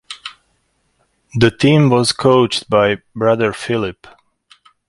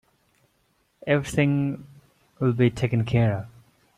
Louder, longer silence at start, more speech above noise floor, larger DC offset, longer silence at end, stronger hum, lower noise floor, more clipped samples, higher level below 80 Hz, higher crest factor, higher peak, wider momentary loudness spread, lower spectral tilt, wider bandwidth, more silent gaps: first, -15 LUFS vs -24 LUFS; second, 0.1 s vs 1.05 s; first, 49 dB vs 45 dB; neither; first, 0.95 s vs 0.5 s; neither; second, -63 dBFS vs -68 dBFS; neither; about the same, -48 dBFS vs -52 dBFS; about the same, 16 dB vs 18 dB; first, 0 dBFS vs -8 dBFS; about the same, 15 LU vs 14 LU; second, -5.5 dB/octave vs -7.5 dB/octave; about the same, 11.5 kHz vs 12 kHz; neither